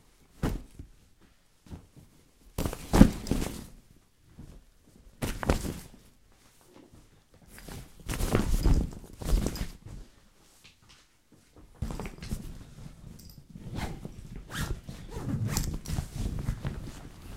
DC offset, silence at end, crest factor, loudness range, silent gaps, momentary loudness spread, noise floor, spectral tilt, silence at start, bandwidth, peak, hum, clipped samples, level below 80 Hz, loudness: under 0.1%; 0 s; 32 dB; 12 LU; none; 22 LU; -62 dBFS; -6 dB/octave; 0.35 s; 16 kHz; 0 dBFS; none; under 0.1%; -36 dBFS; -32 LUFS